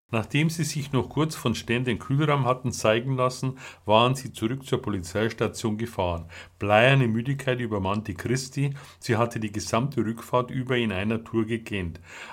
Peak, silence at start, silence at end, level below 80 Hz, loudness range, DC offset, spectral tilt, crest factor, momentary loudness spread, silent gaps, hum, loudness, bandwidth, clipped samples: -4 dBFS; 0.1 s; 0 s; -54 dBFS; 3 LU; under 0.1%; -5.5 dB/octave; 22 dB; 9 LU; none; none; -26 LUFS; 16 kHz; under 0.1%